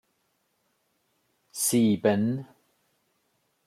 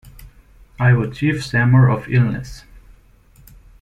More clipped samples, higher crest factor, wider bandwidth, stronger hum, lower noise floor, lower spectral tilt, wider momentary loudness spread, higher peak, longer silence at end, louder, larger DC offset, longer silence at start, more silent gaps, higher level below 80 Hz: neither; about the same, 20 dB vs 16 dB; first, 14.5 kHz vs 9.8 kHz; neither; first, -74 dBFS vs -49 dBFS; second, -5 dB/octave vs -7.5 dB/octave; first, 13 LU vs 9 LU; second, -10 dBFS vs -2 dBFS; about the same, 1.2 s vs 1.2 s; second, -25 LUFS vs -17 LUFS; neither; first, 1.55 s vs 0.2 s; neither; second, -74 dBFS vs -42 dBFS